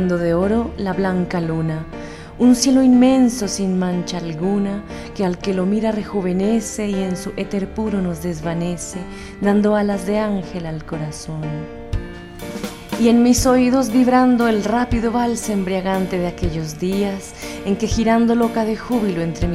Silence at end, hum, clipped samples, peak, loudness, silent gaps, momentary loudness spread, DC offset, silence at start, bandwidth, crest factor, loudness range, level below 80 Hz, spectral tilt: 0 s; none; under 0.1%; -2 dBFS; -19 LUFS; none; 15 LU; under 0.1%; 0 s; 14.5 kHz; 16 dB; 6 LU; -36 dBFS; -6 dB/octave